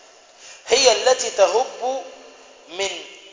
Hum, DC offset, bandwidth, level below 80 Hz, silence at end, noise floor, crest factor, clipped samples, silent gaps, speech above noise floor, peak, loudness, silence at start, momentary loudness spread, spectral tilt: none; under 0.1%; 7.8 kHz; -62 dBFS; 0.15 s; -46 dBFS; 20 dB; under 0.1%; none; 25 dB; -2 dBFS; -19 LUFS; 0.4 s; 20 LU; 0.5 dB/octave